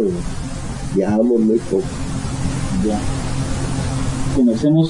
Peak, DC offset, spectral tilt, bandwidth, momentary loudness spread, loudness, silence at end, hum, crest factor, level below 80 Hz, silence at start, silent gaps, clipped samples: -4 dBFS; under 0.1%; -6.5 dB/octave; 11 kHz; 10 LU; -20 LUFS; 0 s; none; 14 dB; -30 dBFS; 0 s; none; under 0.1%